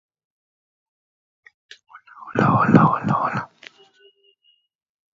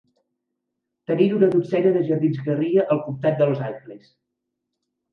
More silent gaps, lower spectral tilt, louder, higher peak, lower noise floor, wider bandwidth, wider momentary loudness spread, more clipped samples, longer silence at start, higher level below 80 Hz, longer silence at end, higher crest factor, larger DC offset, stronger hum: neither; second, -8.5 dB/octave vs -10 dB/octave; first, -18 LUFS vs -21 LUFS; first, 0 dBFS vs -4 dBFS; second, -64 dBFS vs -80 dBFS; first, 7.4 kHz vs 5.6 kHz; first, 19 LU vs 10 LU; neither; first, 1.95 s vs 1.1 s; first, -58 dBFS vs -70 dBFS; first, 1.7 s vs 1.15 s; first, 24 dB vs 18 dB; neither; neither